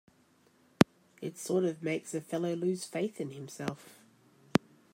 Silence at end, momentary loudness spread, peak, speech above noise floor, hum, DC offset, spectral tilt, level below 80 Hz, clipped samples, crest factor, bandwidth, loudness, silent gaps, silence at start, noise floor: 0.35 s; 13 LU; -4 dBFS; 32 dB; none; under 0.1%; -5.5 dB/octave; -68 dBFS; under 0.1%; 30 dB; 16 kHz; -33 LUFS; none; 0.8 s; -67 dBFS